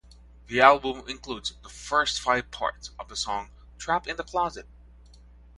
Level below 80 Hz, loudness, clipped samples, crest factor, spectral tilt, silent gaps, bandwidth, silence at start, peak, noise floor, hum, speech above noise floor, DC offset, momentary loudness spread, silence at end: -50 dBFS; -26 LUFS; under 0.1%; 26 dB; -2.5 dB/octave; none; 11.5 kHz; 0.5 s; -2 dBFS; -51 dBFS; none; 25 dB; under 0.1%; 19 LU; 0.95 s